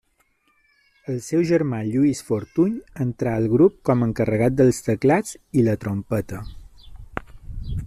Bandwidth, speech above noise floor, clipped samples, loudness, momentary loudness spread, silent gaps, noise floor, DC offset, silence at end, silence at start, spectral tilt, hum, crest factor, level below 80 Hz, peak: 14 kHz; 44 dB; under 0.1%; -21 LUFS; 18 LU; none; -65 dBFS; under 0.1%; 0 s; 1.1 s; -7.5 dB/octave; none; 18 dB; -42 dBFS; -4 dBFS